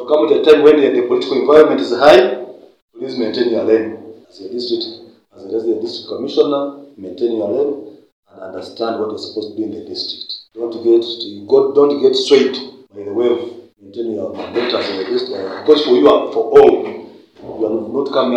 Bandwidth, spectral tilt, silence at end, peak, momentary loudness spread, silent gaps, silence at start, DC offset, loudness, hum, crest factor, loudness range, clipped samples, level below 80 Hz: 9 kHz; -5 dB/octave; 0 s; 0 dBFS; 19 LU; 2.82-2.88 s, 8.12-8.23 s; 0 s; under 0.1%; -15 LUFS; none; 16 dB; 8 LU; 0.5%; -56 dBFS